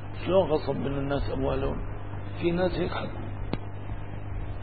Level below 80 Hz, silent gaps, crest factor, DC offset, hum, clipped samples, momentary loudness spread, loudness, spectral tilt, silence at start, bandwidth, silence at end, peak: -38 dBFS; none; 20 dB; 1%; none; under 0.1%; 13 LU; -30 LUFS; -11 dB/octave; 0 s; 4.8 kHz; 0 s; -10 dBFS